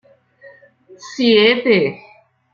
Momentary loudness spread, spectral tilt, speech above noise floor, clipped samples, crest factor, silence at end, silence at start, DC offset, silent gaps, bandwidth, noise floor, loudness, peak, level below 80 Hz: 11 LU; -5 dB/octave; 32 dB; under 0.1%; 18 dB; 0.6 s; 1.05 s; under 0.1%; none; 7.4 kHz; -46 dBFS; -14 LUFS; -2 dBFS; -64 dBFS